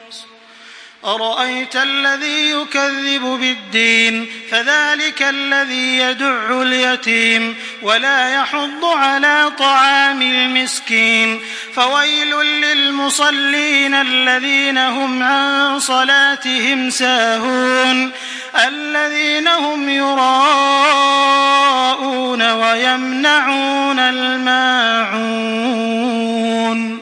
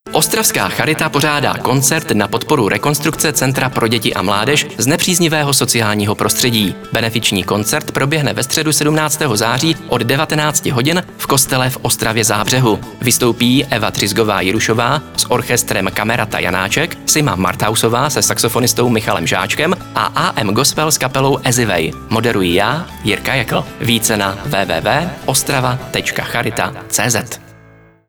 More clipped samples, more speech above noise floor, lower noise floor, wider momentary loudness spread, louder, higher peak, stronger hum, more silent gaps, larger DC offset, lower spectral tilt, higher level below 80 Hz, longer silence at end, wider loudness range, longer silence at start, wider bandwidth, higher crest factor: neither; second, 25 dB vs 29 dB; second, -40 dBFS vs -44 dBFS; about the same, 6 LU vs 5 LU; about the same, -13 LUFS vs -14 LUFS; about the same, 0 dBFS vs 0 dBFS; neither; neither; second, under 0.1% vs 0.2%; second, -1 dB/octave vs -3.5 dB/octave; second, -72 dBFS vs -42 dBFS; second, 0 s vs 0.6 s; about the same, 2 LU vs 2 LU; about the same, 0 s vs 0.05 s; second, 10.5 kHz vs over 20 kHz; about the same, 14 dB vs 14 dB